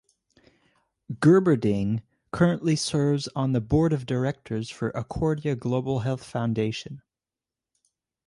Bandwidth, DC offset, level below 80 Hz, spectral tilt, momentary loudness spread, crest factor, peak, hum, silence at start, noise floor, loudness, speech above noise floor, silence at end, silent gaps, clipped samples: 11.5 kHz; under 0.1%; -50 dBFS; -6.5 dB/octave; 13 LU; 18 dB; -8 dBFS; none; 1.1 s; under -90 dBFS; -25 LUFS; over 66 dB; 1.3 s; none; under 0.1%